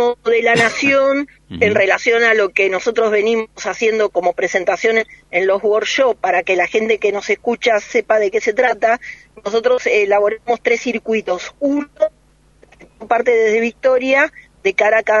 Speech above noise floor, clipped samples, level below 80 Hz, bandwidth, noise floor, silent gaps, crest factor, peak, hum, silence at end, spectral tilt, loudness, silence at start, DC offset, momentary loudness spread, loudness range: 35 dB; under 0.1%; -54 dBFS; 10.5 kHz; -51 dBFS; none; 16 dB; 0 dBFS; none; 0 s; -3.5 dB/octave; -16 LUFS; 0 s; under 0.1%; 7 LU; 3 LU